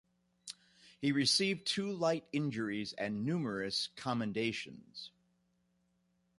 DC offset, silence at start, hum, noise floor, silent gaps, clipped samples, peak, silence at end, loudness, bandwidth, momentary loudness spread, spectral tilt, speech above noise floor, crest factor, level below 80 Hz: under 0.1%; 0.45 s; 60 Hz at -65 dBFS; -77 dBFS; none; under 0.1%; -18 dBFS; 1.3 s; -35 LUFS; 11.5 kHz; 20 LU; -4 dB/octave; 41 dB; 20 dB; -74 dBFS